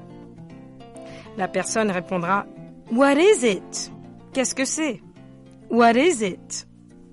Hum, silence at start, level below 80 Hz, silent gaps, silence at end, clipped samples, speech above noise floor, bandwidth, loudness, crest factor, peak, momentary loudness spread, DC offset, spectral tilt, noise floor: none; 0 s; -58 dBFS; none; 0.5 s; under 0.1%; 25 dB; 11.5 kHz; -21 LUFS; 18 dB; -6 dBFS; 26 LU; under 0.1%; -3.5 dB/octave; -46 dBFS